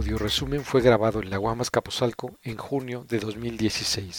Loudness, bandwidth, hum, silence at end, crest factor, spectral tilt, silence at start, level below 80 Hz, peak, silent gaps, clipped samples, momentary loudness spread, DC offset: -26 LUFS; 19 kHz; none; 0 s; 22 dB; -4.5 dB/octave; 0 s; -42 dBFS; -4 dBFS; none; under 0.1%; 11 LU; under 0.1%